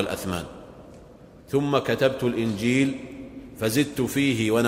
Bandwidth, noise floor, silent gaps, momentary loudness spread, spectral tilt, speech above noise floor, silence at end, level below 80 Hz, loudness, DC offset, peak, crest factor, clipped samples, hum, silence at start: 16 kHz; -48 dBFS; none; 18 LU; -5.5 dB/octave; 24 dB; 0 s; -54 dBFS; -24 LUFS; under 0.1%; -6 dBFS; 18 dB; under 0.1%; none; 0 s